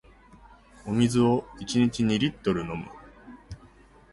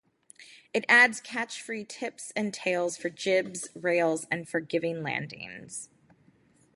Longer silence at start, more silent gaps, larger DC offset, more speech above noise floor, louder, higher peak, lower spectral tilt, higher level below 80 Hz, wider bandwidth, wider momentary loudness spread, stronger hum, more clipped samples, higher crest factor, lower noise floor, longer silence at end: first, 0.85 s vs 0.4 s; neither; neither; second, 29 dB vs 34 dB; about the same, -26 LUFS vs -27 LUFS; about the same, -10 dBFS vs -8 dBFS; first, -6 dB/octave vs -3.5 dB/octave; first, -52 dBFS vs -76 dBFS; about the same, 11.5 kHz vs 11.5 kHz; first, 23 LU vs 18 LU; neither; neither; about the same, 18 dB vs 22 dB; second, -54 dBFS vs -63 dBFS; second, 0.55 s vs 0.9 s